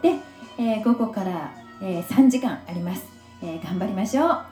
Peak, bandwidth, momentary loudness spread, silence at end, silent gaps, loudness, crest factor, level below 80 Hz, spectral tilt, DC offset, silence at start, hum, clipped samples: -6 dBFS; over 20 kHz; 16 LU; 0 s; none; -24 LUFS; 18 dB; -64 dBFS; -6.5 dB/octave; under 0.1%; 0 s; none; under 0.1%